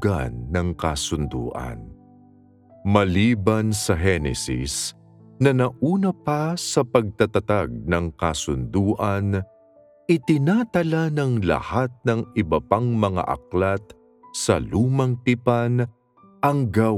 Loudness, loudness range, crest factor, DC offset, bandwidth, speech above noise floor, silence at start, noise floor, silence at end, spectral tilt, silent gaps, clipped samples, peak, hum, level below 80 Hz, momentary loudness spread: -22 LUFS; 2 LU; 20 dB; under 0.1%; 15 kHz; 32 dB; 0 s; -53 dBFS; 0 s; -6 dB/octave; none; under 0.1%; -2 dBFS; none; -42 dBFS; 7 LU